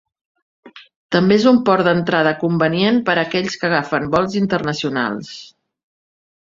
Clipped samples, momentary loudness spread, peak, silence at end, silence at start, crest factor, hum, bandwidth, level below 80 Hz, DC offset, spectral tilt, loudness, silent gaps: under 0.1%; 8 LU; 0 dBFS; 1 s; 0.65 s; 18 dB; none; 7.6 kHz; -54 dBFS; under 0.1%; -6 dB/octave; -17 LUFS; 0.96-1.09 s